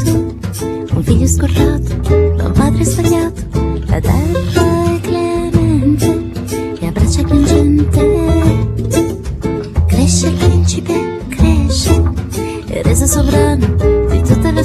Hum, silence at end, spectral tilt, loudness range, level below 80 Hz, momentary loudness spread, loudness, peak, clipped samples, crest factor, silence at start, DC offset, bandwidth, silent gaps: none; 0 s; -6 dB/octave; 1 LU; -20 dBFS; 8 LU; -13 LUFS; 0 dBFS; under 0.1%; 12 dB; 0 s; under 0.1%; 14 kHz; none